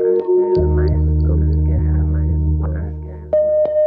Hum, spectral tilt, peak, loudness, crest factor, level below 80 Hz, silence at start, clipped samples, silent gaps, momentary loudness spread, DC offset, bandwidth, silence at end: none; -12.5 dB/octave; -6 dBFS; -17 LUFS; 10 dB; -22 dBFS; 0 s; under 0.1%; none; 7 LU; under 0.1%; 4.9 kHz; 0 s